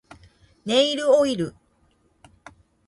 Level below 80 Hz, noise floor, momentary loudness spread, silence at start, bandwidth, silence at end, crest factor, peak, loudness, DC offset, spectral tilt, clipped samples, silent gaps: -60 dBFS; -63 dBFS; 13 LU; 0.65 s; 11.5 kHz; 1.35 s; 18 dB; -6 dBFS; -21 LUFS; under 0.1%; -4 dB/octave; under 0.1%; none